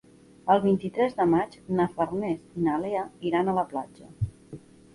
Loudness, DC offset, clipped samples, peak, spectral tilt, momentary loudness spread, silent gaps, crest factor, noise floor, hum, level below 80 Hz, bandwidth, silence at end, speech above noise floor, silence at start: -27 LUFS; under 0.1%; under 0.1%; -8 dBFS; -8 dB/octave; 13 LU; none; 18 dB; -47 dBFS; none; -54 dBFS; 11.5 kHz; 0.35 s; 21 dB; 0.45 s